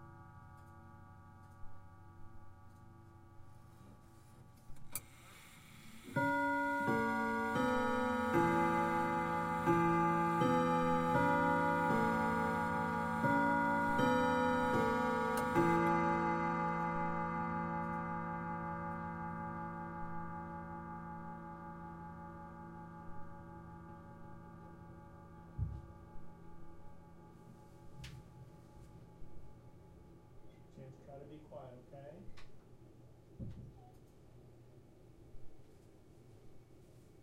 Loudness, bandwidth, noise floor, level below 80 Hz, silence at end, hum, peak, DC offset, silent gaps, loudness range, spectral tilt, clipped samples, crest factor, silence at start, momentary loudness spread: -35 LUFS; 16 kHz; -60 dBFS; -60 dBFS; 0.05 s; none; -20 dBFS; under 0.1%; none; 24 LU; -6.5 dB/octave; under 0.1%; 18 dB; 0 s; 25 LU